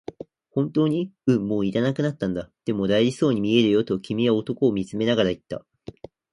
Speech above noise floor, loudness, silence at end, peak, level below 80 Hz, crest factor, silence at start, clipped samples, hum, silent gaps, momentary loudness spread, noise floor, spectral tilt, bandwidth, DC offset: 20 dB; -23 LUFS; 0.75 s; -6 dBFS; -56 dBFS; 18 dB; 0.55 s; under 0.1%; none; none; 11 LU; -42 dBFS; -7 dB/octave; 11 kHz; under 0.1%